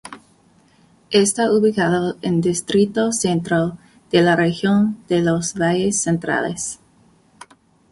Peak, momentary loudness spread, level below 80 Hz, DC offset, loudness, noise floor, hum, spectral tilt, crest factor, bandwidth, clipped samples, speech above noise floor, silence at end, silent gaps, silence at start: -2 dBFS; 6 LU; -54 dBFS; under 0.1%; -18 LUFS; -55 dBFS; none; -4.5 dB/octave; 18 dB; 11.5 kHz; under 0.1%; 37 dB; 1.15 s; none; 0.05 s